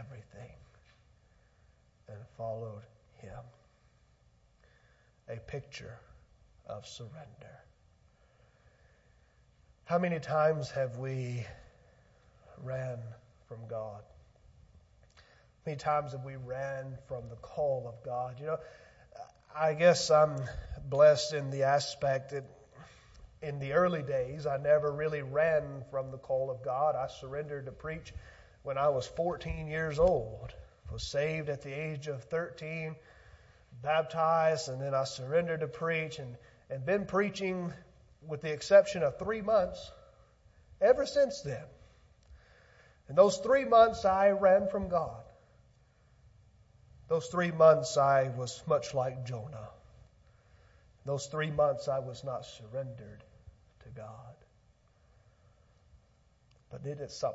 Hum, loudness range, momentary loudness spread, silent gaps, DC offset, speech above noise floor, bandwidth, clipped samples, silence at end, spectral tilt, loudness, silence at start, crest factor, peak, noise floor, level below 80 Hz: none; 20 LU; 23 LU; none; under 0.1%; 35 dB; 8 kHz; under 0.1%; 0 s; -5.5 dB/octave; -31 LUFS; 0 s; 24 dB; -8 dBFS; -67 dBFS; -58 dBFS